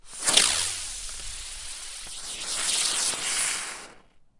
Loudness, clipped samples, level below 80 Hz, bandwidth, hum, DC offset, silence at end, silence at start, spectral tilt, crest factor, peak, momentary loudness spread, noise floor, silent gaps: -25 LUFS; under 0.1%; -50 dBFS; 11.5 kHz; none; under 0.1%; 0.2 s; 0.05 s; 1.5 dB/octave; 26 dB; -2 dBFS; 16 LU; -53 dBFS; none